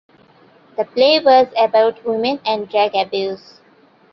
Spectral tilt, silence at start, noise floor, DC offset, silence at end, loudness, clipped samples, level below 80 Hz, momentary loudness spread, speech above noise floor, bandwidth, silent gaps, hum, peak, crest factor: -5 dB/octave; 0.8 s; -51 dBFS; under 0.1%; 0.75 s; -16 LUFS; under 0.1%; -66 dBFS; 13 LU; 36 dB; 6 kHz; none; none; -2 dBFS; 16 dB